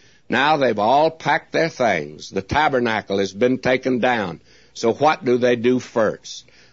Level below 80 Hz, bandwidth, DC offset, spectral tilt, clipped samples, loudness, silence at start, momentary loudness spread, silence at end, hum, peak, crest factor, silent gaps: -52 dBFS; 7.8 kHz; 0.2%; -5 dB/octave; under 0.1%; -19 LUFS; 0.3 s; 12 LU; 0.3 s; none; -4 dBFS; 16 dB; none